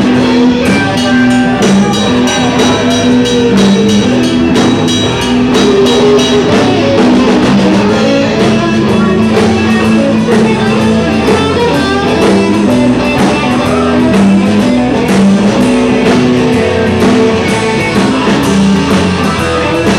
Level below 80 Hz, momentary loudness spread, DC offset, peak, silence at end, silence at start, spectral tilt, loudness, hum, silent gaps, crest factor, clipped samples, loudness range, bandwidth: -32 dBFS; 3 LU; 0.2%; 0 dBFS; 0 s; 0 s; -5.5 dB/octave; -8 LUFS; none; none; 8 dB; under 0.1%; 1 LU; 13 kHz